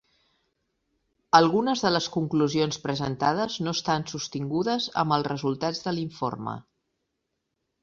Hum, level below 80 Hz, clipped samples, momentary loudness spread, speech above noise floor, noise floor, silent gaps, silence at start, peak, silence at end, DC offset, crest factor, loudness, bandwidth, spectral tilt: none; -64 dBFS; under 0.1%; 10 LU; 54 dB; -80 dBFS; none; 1.35 s; -2 dBFS; 1.2 s; under 0.1%; 26 dB; -26 LUFS; 7.6 kHz; -5 dB/octave